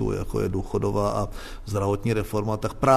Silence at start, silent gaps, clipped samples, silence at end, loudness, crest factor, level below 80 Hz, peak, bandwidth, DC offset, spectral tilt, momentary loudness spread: 0 s; none; under 0.1%; 0 s; -26 LUFS; 20 dB; -38 dBFS; -6 dBFS; 13.5 kHz; under 0.1%; -7 dB/octave; 6 LU